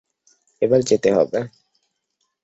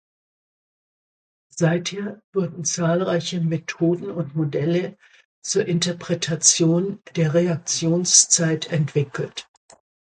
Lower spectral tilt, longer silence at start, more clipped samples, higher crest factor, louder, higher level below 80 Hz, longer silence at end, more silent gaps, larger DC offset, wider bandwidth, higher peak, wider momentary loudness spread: first, -5.5 dB/octave vs -4 dB/octave; second, 0.6 s vs 1.55 s; neither; about the same, 18 dB vs 22 dB; about the same, -19 LUFS vs -21 LUFS; first, -58 dBFS vs -64 dBFS; first, 0.95 s vs 0.65 s; second, none vs 2.24-2.33 s, 5.25-5.42 s; neither; second, 8 kHz vs 9.6 kHz; second, -4 dBFS vs 0 dBFS; second, 10 LU vs 13 LU